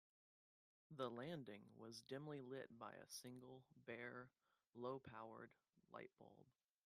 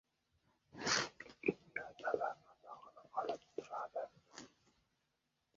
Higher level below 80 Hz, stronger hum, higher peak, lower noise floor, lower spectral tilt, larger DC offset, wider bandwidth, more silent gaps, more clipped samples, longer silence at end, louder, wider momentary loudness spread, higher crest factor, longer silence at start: second, under -90 dBFS vs -78 dBFS; neither; second, -34 dBFS vs -20 dBFS; first, under -90 dBFS vs -85 dBFS; first, -5 dB/octave vs -1.5 dB/octave; neither; first, 14.5 kHz vs 7.4 kHz; neither; neither; second, 0.35 s vs 1.1 s; second, -56 LUFS vs -42 LUFS; second, 12 LU vs 20 LU; about the same, 24 dB vs 26 dB; first, 0.9 s vs 0.75 s